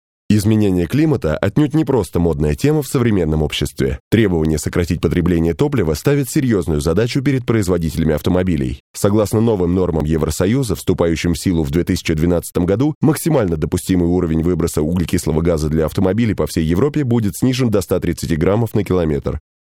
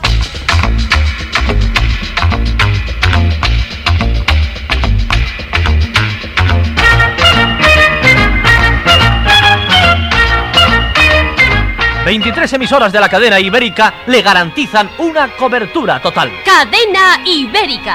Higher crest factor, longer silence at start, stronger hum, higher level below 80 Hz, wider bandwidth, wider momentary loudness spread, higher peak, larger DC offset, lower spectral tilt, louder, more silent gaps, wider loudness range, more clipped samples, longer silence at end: first, 16 dB vs 10 dB; first, 0.3 s vs 0 s; neither; second, -32 dBFS vs -18 dBFS; about the same, 17 kHz vs 16 kHz; second, 3 LU vs 7 LU; about the same, 0 dBFS vs 0 dBFS; neither; first, -6.5 dB/octave vs -4.5 dB/octave; second, -17 LUFS vs -9 LUFS; first, 4.00-4.11 s, 8.80-8.94 s, 12.95-13.01 s vs none; second, 1 LU vs 6 LU; second, under 0.1% vs 0.2%; first, 0.4 s vs 0 s